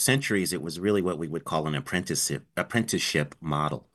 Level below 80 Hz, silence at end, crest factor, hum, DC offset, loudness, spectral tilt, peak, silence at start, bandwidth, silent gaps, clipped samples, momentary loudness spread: -58 dBFS; 0.15 s; 20 dB; none; under 0.1%; -27 LUFS; -4 dB/octave; -8 dBFS; 0 s; 13 kHz; none; under 0.1%; 5 LU